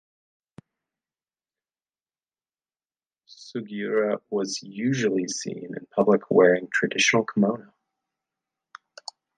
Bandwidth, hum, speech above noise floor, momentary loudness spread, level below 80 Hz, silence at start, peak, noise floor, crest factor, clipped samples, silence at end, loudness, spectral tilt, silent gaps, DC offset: 9.6 kHz; none; over 66 dB; 17 LU; -72 dBFS; 3.3 s; -4 dBFS; under -90 dBFS; 22 dB; under 0.1%; 1.75 s; -23 LUFS; -4.5 dB/octave; none; under 0.1%